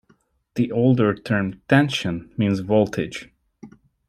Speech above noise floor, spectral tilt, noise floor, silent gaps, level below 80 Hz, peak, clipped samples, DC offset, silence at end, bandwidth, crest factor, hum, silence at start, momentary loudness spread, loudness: 41 dB; -7 dB/octave; -62 dBFS; none; -54 dBFS; -4 dBFS; under 0.1%; under 0.1%; 0.4 s; 13 kHz; 18 dB; none; 0.55 s; 10 LU; -21 LUFS